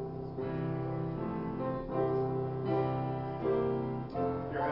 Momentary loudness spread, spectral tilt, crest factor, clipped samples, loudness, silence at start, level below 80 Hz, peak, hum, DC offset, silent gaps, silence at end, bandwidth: 5 LU; -8 dB/octave; 14 dB; under 0.1%; -35 LUFS; 0 s; -56 dBFS; -20 dBFS; none; under 0.1%; none; 0 s; 5.6 kHz